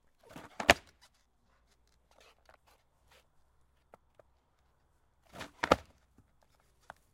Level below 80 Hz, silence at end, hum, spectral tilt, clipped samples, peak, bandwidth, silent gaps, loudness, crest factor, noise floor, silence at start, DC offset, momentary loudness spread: -60 dBFS; 1.35 s; none; -3 dB/octave; under 0.1%; -2 dBFS; 16.5 kHz; none; -30 LUFS; 38 dB; -72 dBFS; 0.35 s; under 0.1%; 26 LU